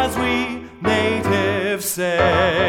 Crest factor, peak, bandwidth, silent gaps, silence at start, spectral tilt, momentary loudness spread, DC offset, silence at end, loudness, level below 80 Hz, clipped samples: 16 dB; -4 dBFS; 18.5 kHz; none; 0 s; -4.5 dB/octave; 6 LU; under 0.1%; 0 s; -19 LUFS; -40 dBFS; under 0.1%